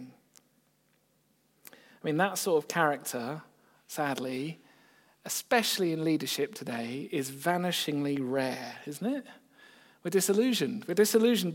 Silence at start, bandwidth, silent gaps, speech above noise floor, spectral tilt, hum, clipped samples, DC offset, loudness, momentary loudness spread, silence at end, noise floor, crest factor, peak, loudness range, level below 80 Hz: 0 s; 17 kHz; none; 41 dB; -4 dB/octave; none; under 0.1%; under 0.1%; -30 LUFS; 13 LU; 0 s; -71 dBFS; 22 dB; -10 dBFS; 3 LU; -86 dBFS